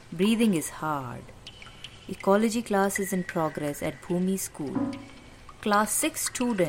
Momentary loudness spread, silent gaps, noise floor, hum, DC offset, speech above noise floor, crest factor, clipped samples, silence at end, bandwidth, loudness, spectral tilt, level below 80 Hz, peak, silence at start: 20 LU; none; -48 dBFS; none; under 0.1%; 21 dB; 18 dB; under 0.1%; 0 s; 16.5 kHz; -27 LUFS; -4.5 dB/octave; -56 dBFS; -10 dBFS; 0 s